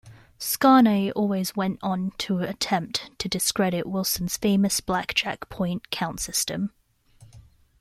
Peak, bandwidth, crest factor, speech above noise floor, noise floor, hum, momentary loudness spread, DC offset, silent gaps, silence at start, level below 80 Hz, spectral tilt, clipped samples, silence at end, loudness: -6 dBFS; 16 kHz; 20 dB; 30 dB; -54 dBFS; none; 11 LU; under 0.1%; none; 0.05 s; -54 dBFS; -4 dB/octave; under 0.1%; 0.4 s; -24 LUFS